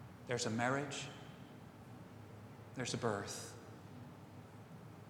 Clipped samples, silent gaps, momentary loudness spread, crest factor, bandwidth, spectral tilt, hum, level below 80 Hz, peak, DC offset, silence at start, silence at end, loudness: under 0.1%; none; 18 LU; 24 dB; over 20 kHz; -4 dB/octave; none; -74 dBFS; -20 dBFS; under 0.1%; 0 s; 0 s; -41 LUFS